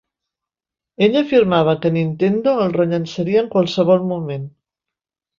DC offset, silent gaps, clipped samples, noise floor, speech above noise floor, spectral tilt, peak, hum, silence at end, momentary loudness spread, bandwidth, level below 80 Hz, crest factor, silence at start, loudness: under 0.1%; none; under 0.1%; -88 dBFS; 72 dB; -7.5 dB/octave; -2 dBFS; none; 0.9 s; 9 LU; 7.4 kHz; -58 dBFS; 16 dB; 1 s; -17 LUFS